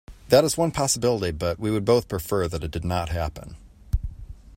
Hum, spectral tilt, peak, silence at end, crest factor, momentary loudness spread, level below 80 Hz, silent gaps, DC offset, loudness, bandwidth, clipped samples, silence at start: none; -5 dB/octave; -2 dBFS; 0 s; 22 dB; 13 LU; -38 dBFS; none; under 0.1%; -24 LUFS; 16.5 kHz; under 0.1%; 0.1 s